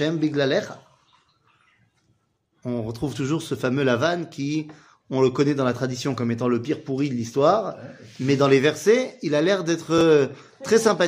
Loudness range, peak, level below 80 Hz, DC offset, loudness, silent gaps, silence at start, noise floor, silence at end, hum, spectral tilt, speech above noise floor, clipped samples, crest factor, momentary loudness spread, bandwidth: 8 LU; -4 dBFS; -60 dBFS; under 0.1%; -22 LUFS; none; 0 s; -69 dBFS; 0 s; none; -5.5 dB/octave; 47 dB; under 0.1%; 18 dB; 11 LU; 15.5 kHz